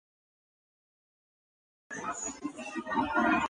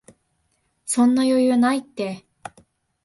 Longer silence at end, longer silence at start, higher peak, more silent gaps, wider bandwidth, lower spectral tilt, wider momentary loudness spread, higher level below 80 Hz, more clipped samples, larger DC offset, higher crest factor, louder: second, 0 s vs 0.85 s; first, 1.9 s vs 0.85 s; second, -14 dBFS vs -8 dBFS; neither; second, 10 kHz vs 11.5 kHz; about the same, -3.5 dB/octave vs -4 dB/octave; second, 12 LU vs 24 LU; about the same, -62 dBFS vs -66 dBFS; neither; neither; first, 22 dB vs 16 dB; second, -33 LUFS vs -20 LUFS